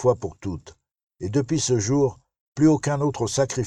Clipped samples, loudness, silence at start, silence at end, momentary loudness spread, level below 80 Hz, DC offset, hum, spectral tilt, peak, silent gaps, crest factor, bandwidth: under 0.1%; -23 LUFS; 0 s; 0 s; 14 LU; -52 dBFS; under 0.1%; none; -5.5 dB/octave; -6 dBFS; 1.03-1.07 s, 2.41-2.56 s; 16 dB; 11.5 kHz